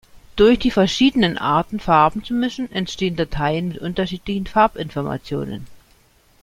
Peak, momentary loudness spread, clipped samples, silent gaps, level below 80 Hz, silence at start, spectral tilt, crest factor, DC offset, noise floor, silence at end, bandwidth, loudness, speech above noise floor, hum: -2 dBFS; 11 LU; under 0.1%; none; -40 dBFS; 0.15 s; -6 dB/octave; 18 dB; under 0.1%; -55 dBFS; 0.65 s; 14.5 kHz; -19 LUFS; 36 dB; none